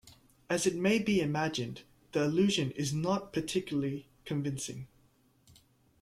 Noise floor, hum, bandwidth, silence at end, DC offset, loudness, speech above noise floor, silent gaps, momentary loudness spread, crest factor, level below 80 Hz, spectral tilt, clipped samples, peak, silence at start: -67 dBFS; none; 14.5 kHz; 1.15 s; under 0.1%; -32 LUFS; 36 dB; none; 13 LU; 18 dB; -64 dBFS; -5 dB/octave; under 0.1%; -16 dBFS; 0.05 s